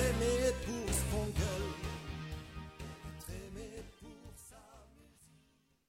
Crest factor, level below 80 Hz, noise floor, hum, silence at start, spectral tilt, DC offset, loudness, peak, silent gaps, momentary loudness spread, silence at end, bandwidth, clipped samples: 18 dB; -46 dBFS; -71 dBFS; none; 0 s; -4.5 dB/octave; under 0.1%; -38 LUFS; -20 dBFS; none; 21 LU; 0.65 s; 16 kHz; under 0.1%